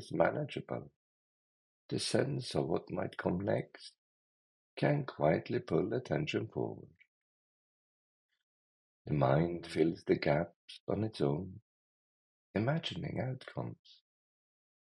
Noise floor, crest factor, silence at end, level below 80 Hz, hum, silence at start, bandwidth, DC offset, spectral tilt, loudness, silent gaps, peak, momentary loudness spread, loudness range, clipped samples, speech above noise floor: under -90 dBFS; 24 dB; 1.15 s; -68 dBFS; none; 0 s; 11.5 kHz; under 0.1%; -6.5 dB/octave; -35 LUFS; 0.96-1.89 s, 3.98-4.77 s, 7.08-8.29 s, 8.43-9.05 s, 10.56-10.68 s, 10.80-10.87 s, 11.62-12.54 s; -14 dBFS; 12 LU; 5 LU; under 0.1%; over 55 dB